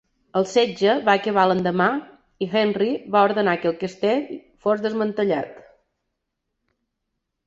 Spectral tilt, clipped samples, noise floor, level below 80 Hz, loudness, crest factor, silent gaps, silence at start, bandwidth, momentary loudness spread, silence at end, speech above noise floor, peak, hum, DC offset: -6 dB/octave; under 0.1%; -79 dBFS; -64 dBFS; -21 LUFS; 20 dB; none; 0.35 s; 8 kHz; 9 LU; 1.9 s; 58 dB; -2 dBFS; none; under 0.1%